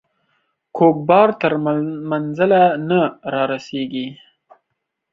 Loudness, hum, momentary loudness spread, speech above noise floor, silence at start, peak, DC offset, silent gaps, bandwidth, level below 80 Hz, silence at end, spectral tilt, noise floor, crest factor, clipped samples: -17 LUFS; none; 12 LU; 60 dB; 0.75 s; -2 dBFS; under 0.1%; none; 7.6 kHz; -64 dBFS; 1 s; -8 dB/octave; -76 dBFS; 16 dB; under 0.1%